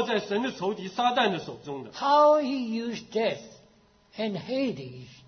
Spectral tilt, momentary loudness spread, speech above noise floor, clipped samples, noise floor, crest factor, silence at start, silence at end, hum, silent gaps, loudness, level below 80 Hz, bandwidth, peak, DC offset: -5 dB/octave; 17 LU; 33 dB; under 0.1%; -60 dBFS; 16 dB; 0 s; 0.15 s; none; none; -27 LUFS; -70 dBFS; 6.6 kHz; -10 dBFS; under 0.1%